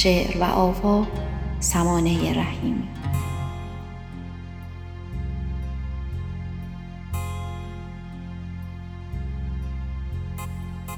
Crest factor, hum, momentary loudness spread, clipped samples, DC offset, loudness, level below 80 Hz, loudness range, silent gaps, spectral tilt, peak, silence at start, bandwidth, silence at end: 22 dB; none; 16 LU; under 0.1%; under 0.1%; -27 LUFS; -34 dBFS; 10 LU; none; -5.5 dB/octave; -4 dBFS; 0 s; over 20 kHz; 0 s